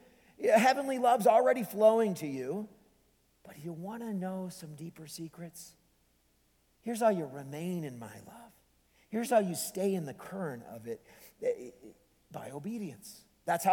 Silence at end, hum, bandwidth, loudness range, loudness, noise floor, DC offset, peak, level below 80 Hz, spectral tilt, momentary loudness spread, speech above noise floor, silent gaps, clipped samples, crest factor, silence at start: 0 s; none; 19 kHz; 14 LU; -31 LUFS; -71 dBFS; under 0.1%; -12 dBFS; -74 dBFS; -5 dB/octave; 21 LU; 39 dB; none; under 0.1%; 20 dB; 0.4 s